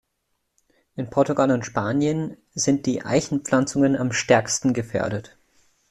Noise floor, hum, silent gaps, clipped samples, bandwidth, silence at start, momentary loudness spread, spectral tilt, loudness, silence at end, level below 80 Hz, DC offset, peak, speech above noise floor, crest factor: -74 dBFS; none; none; under 0.1%; 12 kHz; 0.95 s; 9 LU; -5 dB/octave; -22 LUFS; 0.65 s; -56 dBFS; under 0.1%; -2 dBFS; 53 dB; 20 dB